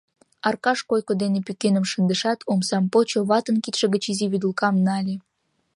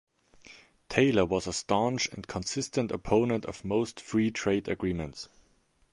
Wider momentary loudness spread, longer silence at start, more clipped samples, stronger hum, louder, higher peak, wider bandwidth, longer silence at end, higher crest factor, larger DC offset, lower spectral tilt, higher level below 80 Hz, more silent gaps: second, 4 LU vs 9 LU; about the same, 0.45 s vs 0.45 s; neither; neither; first, -22 LUFS vs -29 LUFS; about the same, -4 dBFS vs -6 dBFS; about the same, 11.5 kHz vs 11.5 kHz; about the same, 0.55 s vs 0.65 s; second, 18 dB vs 24 dB; neither; about the same, -5 dB/octave vs -5 dB/octave; second, -70 dBFS vs -52 dBFS; neither